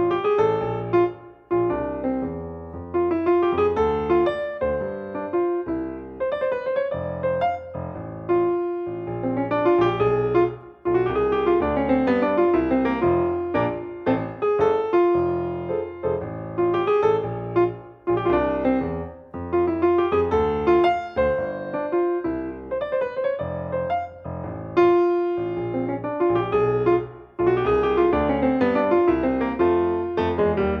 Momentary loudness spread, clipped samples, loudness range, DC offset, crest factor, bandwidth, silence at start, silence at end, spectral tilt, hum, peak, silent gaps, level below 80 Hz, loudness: 9 LU; under 0.1%; 5 LU; under 0.1%; 16 dB; 5.4 kHz; 0 s; 0 s; -9 dB/octave; none; -6 dBFS; none; -44 dBFS; -23 LUFS